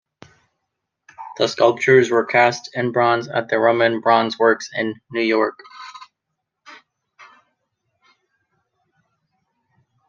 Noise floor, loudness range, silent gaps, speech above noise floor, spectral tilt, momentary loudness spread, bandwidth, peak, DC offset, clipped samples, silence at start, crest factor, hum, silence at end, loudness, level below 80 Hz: -79 dBFS; 10 LU; none; 61 dB; -5 dB/octave; 22 LU; 7.4 kHz; -2 dBFS; under 0.1%; under 0.1%; 1.2 s; 20 dB; none; 3.35 s; -18 LUFS; -70 dBFS